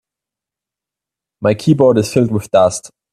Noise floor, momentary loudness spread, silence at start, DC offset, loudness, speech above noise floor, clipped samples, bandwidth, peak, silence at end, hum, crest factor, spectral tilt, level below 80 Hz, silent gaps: -86 dBFS; 7 LU; 1.4 s; under 0.1%; -14 LUFS; 73 dB; under 0.1%; 14 kHz; 0 dBFS; 0.25 s; none; 16 dB; -6.5 dB/octave; -54 dBFS; none